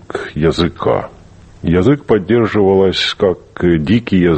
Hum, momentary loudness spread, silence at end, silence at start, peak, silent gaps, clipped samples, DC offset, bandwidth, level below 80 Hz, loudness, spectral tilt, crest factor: none; 6 LU; 0 s; 0.15 s; 0 dBFS; none; under 0.1%; under 0.1%; 8.6 kHz; -36 dBFS; -14 LUFS; -7 dB/octave; 14 dB